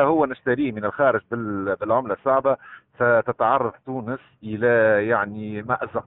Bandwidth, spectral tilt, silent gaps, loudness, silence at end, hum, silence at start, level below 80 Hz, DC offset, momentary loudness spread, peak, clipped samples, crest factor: 4 kHz; -5.5 dB/octave; none; -22 LUFS; 0.05 s; none; 0 s; -60 dBFS; under 0.1%; 11 LU; -6 dBFS; under 0.1%; 16 dB